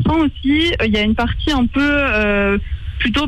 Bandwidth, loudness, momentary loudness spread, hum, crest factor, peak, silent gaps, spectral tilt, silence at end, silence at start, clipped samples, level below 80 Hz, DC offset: 11 kHz; -16 LUFS; 4 LU; none; 10 dB; -6 dBFS; none; -6 dB/octave; 0 s; 0 s; under 0.1%; -26 dBFS; under 0.1%